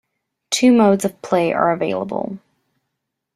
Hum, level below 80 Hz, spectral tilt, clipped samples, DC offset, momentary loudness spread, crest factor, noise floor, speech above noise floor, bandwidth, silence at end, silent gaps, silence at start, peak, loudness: none; -60 dBFS; -5 dB/octave; under 0.1%; under 0.1%; 13 LU; 16 dB; -78 dBFS; 61 dB; 14 kHz; 1 s; none; 0.5 s; -2 dBFS; -17 LUFS